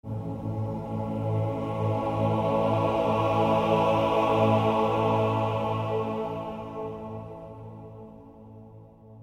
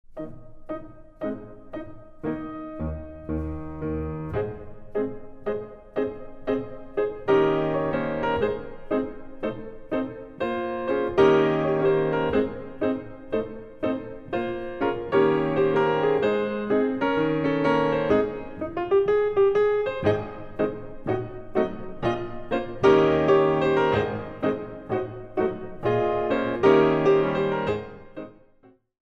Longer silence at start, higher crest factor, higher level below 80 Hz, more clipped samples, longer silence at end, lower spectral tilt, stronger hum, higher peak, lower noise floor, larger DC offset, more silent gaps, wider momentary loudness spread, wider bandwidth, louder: about the same, 0.05 s vs 0.1 s; about the same, 16 dB vs 20 dB; second, -52 dBFS vs -46 dBFS; neither; second, 0 s vs 0.8 s; about the same, -8 dB/octave vs -8 dB/octave; neither; second, -12 dBFS vs -6 dBFS; second, -49 dBFS vs -57 dBFS; neither; neither; first, 18 LU vs 15 LU; first, 9.6 kHz vs 6.2 kHz; about the same, -26 LUFS vs -25 LUFS